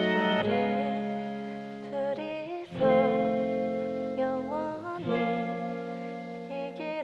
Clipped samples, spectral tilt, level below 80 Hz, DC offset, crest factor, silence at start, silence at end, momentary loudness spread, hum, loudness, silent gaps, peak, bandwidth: under 0.1%; -7.5 dB/octave; -66 dBFS; under 0.1%; 18 dB; 0 s; 0 s; 12 LU; none; -30 LUFS; none; -12 dBFS; 8 kHz